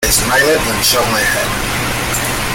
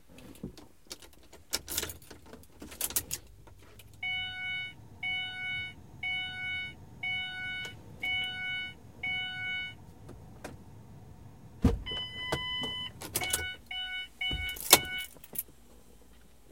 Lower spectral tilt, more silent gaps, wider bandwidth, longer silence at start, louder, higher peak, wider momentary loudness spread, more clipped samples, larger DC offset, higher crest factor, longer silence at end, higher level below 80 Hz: about the same, -2 dB/octave vs -2 dB/octave; neither; about the same, 17 kHz vs 17 kHz; about the same, 0 s vs 0.1 s; first, -13 LUFS vs -33 LUFS; about the same, 0 dBFS vs 0 dBFS; second, 6 LU vs 20 LU; neither; second, under 0.1% vs 0.1%; second, 14 dB vs 36 dB; second, 0 s vs 0.25 s; first, -28 dBFS vs -48 dBFS